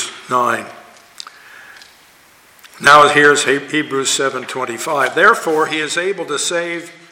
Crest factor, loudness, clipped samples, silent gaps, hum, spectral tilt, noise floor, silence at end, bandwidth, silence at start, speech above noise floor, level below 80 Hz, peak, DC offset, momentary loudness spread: 16 dB; -14 LUFS; under 0.1%; none; none; -2 dB/octave; -47 dBFS; 0.2 s; 17 kHz; 0 s; 33 dB; -58 dBFS; 0 dBFS; under 0.1%; 17 LU